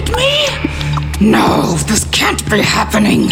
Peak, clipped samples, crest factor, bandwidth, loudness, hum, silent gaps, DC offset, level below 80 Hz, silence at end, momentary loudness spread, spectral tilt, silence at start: 0 dBFS; under 0.1%; 12 dB; 17 kHz; -12 LUFS; none; none; under 0.1%; -26 dBFS; 0 s; 6 LU; -4 dB/octave; 0 s